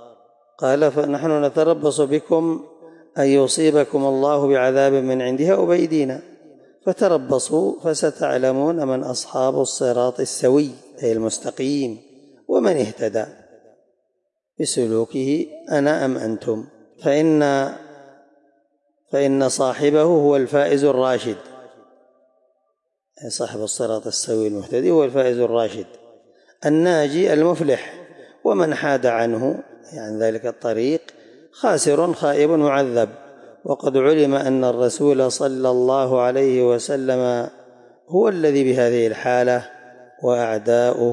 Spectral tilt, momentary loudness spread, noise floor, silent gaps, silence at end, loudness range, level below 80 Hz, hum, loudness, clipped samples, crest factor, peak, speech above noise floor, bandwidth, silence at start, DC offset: -5 dB/octave; 9 LU; -75 dBFS; none; 0 s; 5 LU; -74 dBFS; none; -19 LUFS; under 0.1%; 14 dB; -6 dBFS; 56 dB; 11.5 kHz; 0 s; under 0.1%